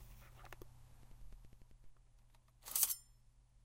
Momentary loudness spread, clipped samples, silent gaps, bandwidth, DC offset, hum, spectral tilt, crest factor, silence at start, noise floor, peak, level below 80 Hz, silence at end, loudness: 27 LU; under 0.1%; none; 16 kHz; under 0.1%; none; 0 dB/octave; 30 dB; 0 s; -67 dBFS; -16 dBFS; -62 dBFS; 0 s; -37 LUFS